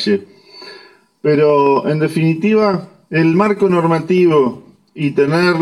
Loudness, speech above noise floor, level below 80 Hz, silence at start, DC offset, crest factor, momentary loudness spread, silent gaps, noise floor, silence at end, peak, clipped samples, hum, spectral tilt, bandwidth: -14 LUFS; 30 dB; -58 dBFS; 0 s; under 0.1%; 14 dB; 10 LU; none; -44 dBFS; 0 s; -2 dBFS; under 0.1%; none; -7.5 dB/octave; 12 kHz